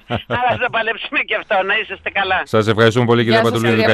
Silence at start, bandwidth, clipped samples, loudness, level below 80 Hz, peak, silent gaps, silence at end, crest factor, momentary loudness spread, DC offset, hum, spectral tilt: 0.1 s; 13.5 kHz; under 0.1%; -16 LUFS; -50 dBFS; 0 dBFS; none; 0 s; 16 dB; 6 LU; under 0.1%; none; -6 dB/octave